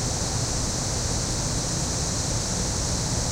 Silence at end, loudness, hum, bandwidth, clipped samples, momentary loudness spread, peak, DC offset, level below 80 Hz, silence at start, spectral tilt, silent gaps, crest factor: 0 s; -25 LUFS; none; 16 kHz; under 0.1%; 0 LU; -12 dBFS; under 0.1%; -34 dBFS; 0 s; -3 dB/octave; none; 14 dB